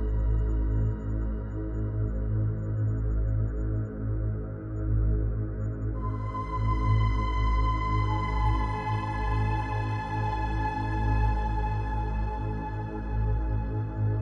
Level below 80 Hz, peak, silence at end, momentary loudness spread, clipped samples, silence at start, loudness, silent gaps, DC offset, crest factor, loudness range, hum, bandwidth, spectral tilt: -30 dBFS; -14 dBFS; 0 s; 6 LU; under 0.1%; 0 s; -30 LUFS; none; under 0.1%; 12 dB; 3 LU; none; 6.4 kHz; -8.5 dB/octave